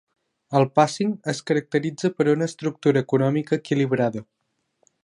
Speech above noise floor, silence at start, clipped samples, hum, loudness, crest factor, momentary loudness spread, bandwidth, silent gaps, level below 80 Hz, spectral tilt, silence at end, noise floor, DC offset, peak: 48 dB; 0.5 s; under 0.1%; none; -22 LUFS; 20 dB; 6 LU; 11.5 kHz; none; -68 dBFS; -6.5 dB/octave; 0.8 s; -70 dBFS; under 0.1%; -2 dBFS